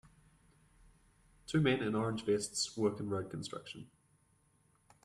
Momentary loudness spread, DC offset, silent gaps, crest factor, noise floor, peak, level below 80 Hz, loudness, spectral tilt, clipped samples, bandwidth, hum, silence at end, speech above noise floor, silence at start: 16 LU; under 0.1%; none; 20 dB; -72 dBFS; -18 dBFS; -66 dBFS; -36 LUFS; -5 dB/octave; under 0.1%; 13 kHz; none; 1.2 s; 37 dB; 1.5 s